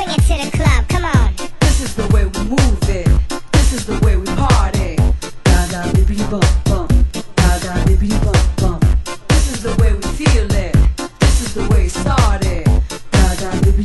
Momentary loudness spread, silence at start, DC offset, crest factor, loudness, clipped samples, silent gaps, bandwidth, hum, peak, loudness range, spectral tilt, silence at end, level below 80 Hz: 3 LU; 0 s; under 0.1%; 14 dB; -16 LUFS; under 0.1%; none; 12.5 kHz; none; 0 dBFS; 1 LU; -5.5 dB/octave; 0 s; -16 dBFS